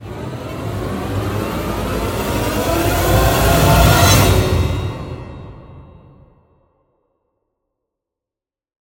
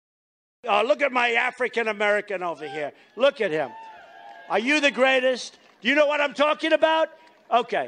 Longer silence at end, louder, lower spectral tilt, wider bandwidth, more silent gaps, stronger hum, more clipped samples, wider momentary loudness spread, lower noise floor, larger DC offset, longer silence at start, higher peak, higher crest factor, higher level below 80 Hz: first, 3.05 s vs 0 s; first, -16 LUFS vs -23 LUFS; first, -5 dB/octave vs -3 dB/octave; first, 17 kHz vs 10 kHz; neither; neither; neither; first, 18 LU vs 12 LU; first, -88 dBFS vs -45 dBFS; neither; second, 0 s vs 0.65 s; first, 0 dBFS vs -8 dBFS; about the same, 18 dB vs 16 dB; first, -26 dBFS vs -74 dBFS